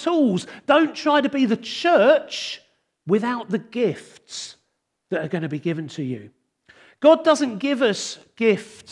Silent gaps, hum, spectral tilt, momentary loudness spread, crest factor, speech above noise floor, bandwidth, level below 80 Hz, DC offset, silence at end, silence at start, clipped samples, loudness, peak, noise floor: none; none; -5 dB/octave; 17 LU; 18 dB; 53 dB; 11.5 kHz; -76 dBFS; under 0.1%; 0 s; 0 s; under 0.1%; -21 LUFS; -2 dBFS; -74 dBFS